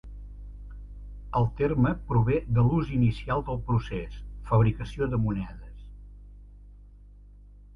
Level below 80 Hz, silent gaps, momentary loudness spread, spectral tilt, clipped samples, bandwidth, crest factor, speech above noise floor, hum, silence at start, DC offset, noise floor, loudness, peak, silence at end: -40 dBFS; none; 21 LU; -9.5 dB/octave; under 0.1%; 6.4 kHz; 18 dB; 24 dB; 50 Hz at -40 dBFS; 0.05 s; under 0.1%; -50 dBFS; -27 LUFS; -10 dBFS; 0 s